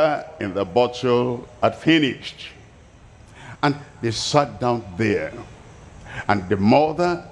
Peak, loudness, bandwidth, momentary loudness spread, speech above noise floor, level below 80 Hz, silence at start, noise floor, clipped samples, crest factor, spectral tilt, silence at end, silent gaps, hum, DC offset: -2 dBFS; -21 LUFS; 11.5 kHz; 17 LU; 26 dB; -50 dBFS; 0 s; -47 dBFS; under 0.1%; 20 dB; -5.5 dB/octave; 0 s; none; none; under 0.1%